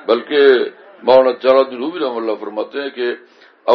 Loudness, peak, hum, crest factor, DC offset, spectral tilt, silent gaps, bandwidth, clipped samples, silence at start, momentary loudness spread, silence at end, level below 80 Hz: -16 LUFS; 0 dBFS; none; 16 dB; under 0.1%; -6 dB/octave; none; 5.6 kHz; under 0.1%; 0.05 s; 12 LU; 0 s; -68 dBFS